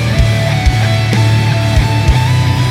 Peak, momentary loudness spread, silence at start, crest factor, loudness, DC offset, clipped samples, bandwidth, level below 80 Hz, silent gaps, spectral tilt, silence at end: 0 dBFS; 1 LU; 0 s; 10 dB; -12 LUFS; under 0.1%; under 0.1%; 14.5 kHz; -20 dBFS; none; -5.5 dB/octave; 0 s